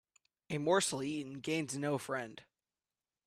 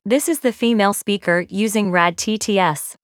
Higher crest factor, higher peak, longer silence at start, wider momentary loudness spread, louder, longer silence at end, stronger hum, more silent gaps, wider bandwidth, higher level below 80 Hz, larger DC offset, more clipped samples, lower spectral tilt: about the same, 20 dB vs 18 dB; second, -18 dBFS vs 0 dBFS; first, 0.5 s vs 0.05 s; first, 11 LU vs 4 LU; second, -36 LUFS vs -18 LUFS; first, 0.85 s vs 0.1 s; neither; neither; second, 15 kHz vs 19 kHz; second, -76 dBFS vs -62 dBFS; neither; neither; about the same, -4 dB/octave vs -4 dB/octave